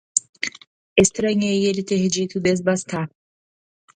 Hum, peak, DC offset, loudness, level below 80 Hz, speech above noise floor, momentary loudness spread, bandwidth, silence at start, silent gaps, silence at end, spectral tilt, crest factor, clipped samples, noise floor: none; 0 dBFS; under 0.1%; -21 LUFS; -54 dBFS; over 70 dB; 11 LU; 11 kHz; 0.15 s; 0.29-0.33 s, 0.67-0.96 s; 0.9 s; -4 dB/octave; 22 dB; under 0.1%; under -90 dBFS